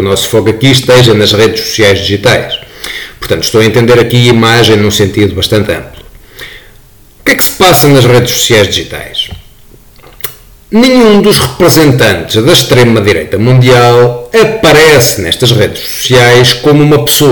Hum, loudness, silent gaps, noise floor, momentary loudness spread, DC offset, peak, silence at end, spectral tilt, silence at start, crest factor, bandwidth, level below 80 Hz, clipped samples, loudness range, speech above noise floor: none; -6 LUFS; none; -37 dBFS; 12 LU; under 0.1%; 0 dBFS; 0 s; -4.5 dB/octave; 0 s; 6 dB; 19.5 kHz; -32 dBFS; 0.9%; 4 LU; 31 dB